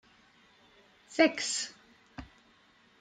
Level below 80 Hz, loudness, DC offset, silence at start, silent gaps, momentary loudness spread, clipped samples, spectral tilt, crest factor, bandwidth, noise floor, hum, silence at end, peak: -64 dBFS; -30 LUFS; under 0.1%; 1.1 s; none; 24 LU; under 0.1%; -2 dB/octave; 24 dB; 9.6 kHz; -64 dBFS; none; 0.75 s; -10 dBFS